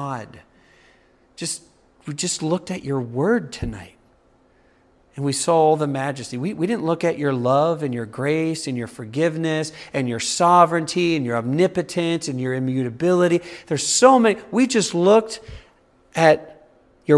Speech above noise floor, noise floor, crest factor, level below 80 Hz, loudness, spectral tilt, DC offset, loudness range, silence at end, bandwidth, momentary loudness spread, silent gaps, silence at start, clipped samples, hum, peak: 37 dB; -57 dBFS; 20 dB; -52 dBFS; -20 LUFS; -5 dB/octave; under 0.1%; 8 LU; 0 s; 12 kHz; 14 LU; none; 0 s; under 0.1%; none; 0 dBFS